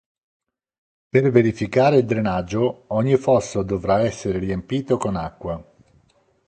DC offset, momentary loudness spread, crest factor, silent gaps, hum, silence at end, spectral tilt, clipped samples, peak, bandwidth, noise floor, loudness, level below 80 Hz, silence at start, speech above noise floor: under 0.1%; 10 LU; 20 dB; none; none; 0.85 s; -7 dB/octave; under 0.1%; 0 dBFS; 9.2 kHz; -61 dBFS; -20 LUFS; -46 dBFS; 1.15 s; 41 dB